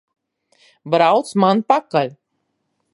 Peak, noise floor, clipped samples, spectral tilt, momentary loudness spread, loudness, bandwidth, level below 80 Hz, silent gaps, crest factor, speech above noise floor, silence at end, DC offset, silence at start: 0 dBFS; -72 dBFS; under 0.1%; -6 dB/octave; 6 LU; -17 LUFS; 11.5 kHz; -70 dBFS; none; 18 dB; 56 dB; 0.85 s; under 0.1%; 0.85 s